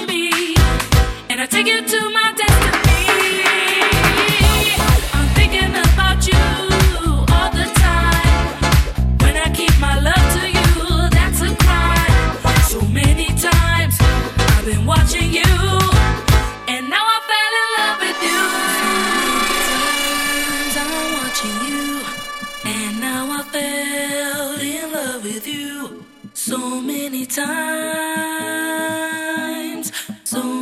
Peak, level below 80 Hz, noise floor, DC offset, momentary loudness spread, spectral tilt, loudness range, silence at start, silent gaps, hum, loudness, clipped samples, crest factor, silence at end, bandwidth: -2 dBFS; -20 dBFS; -37 dBFS; under 0.1%; 9 LU; -4 dB/octave; 8 LU; 0 s; none; none; -16 LUFS; under 0.1%; 14 dB; 0 s; 16.5 kHz